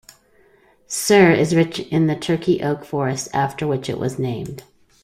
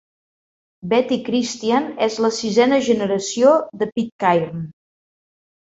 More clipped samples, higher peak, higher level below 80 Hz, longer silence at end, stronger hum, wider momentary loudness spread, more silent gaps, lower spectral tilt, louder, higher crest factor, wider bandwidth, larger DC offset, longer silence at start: neither; about the same, -2 dBFS vs -2 dBFS; first, -54 dBFS vs -62 dBFS; second, 0.4 s vs 1.05 s; neither; first, 13 LU vs 9 LU; second, none vs 4.12-4.19 s; about the same, -5.5 dB/octave vs -4.5 dB/octave; about the same, -19 LUFS vs -19 LUFS; about the same, 18 dB vs 18 dB; first, 15.5 kHz vs 8 kHz; neither; about the same, 0.9 s vs 0.85 s